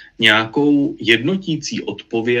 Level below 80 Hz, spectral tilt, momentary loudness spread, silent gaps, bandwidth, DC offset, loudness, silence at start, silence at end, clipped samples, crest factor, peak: -58 dBFS; -4.5 dB/octave; 11 LU; none; 12.5 kHz; under 0.1%; -17 LUFS; 0 s; 0 s; under 0.1%; 18 dB; 0 dBFS